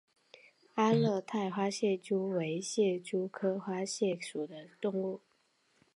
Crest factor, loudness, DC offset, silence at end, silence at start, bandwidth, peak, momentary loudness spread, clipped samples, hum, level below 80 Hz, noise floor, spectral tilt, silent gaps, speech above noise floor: 20 dB; -34 LUFS; under 0.1%; 0.8 s; 0.75 s; 11.5 kHz; -14 dBFS; 10 LU; under 0.1%; none; -84 dBFS; -73 dBFS; -5.5 dB/octave; none; 40 dB